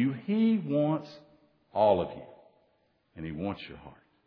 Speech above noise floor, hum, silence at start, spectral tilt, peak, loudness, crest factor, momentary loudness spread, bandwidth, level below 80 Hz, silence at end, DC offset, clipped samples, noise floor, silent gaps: 42 dB; none; 0 s; -9.5 dB/octave; -12 dBFS; -29 LUFS; 18 dB; 20 LU; 5.4 kHz; -62 dBFS; 0.35 s; under 0.1%; under 0.1%; -71 dBFS; none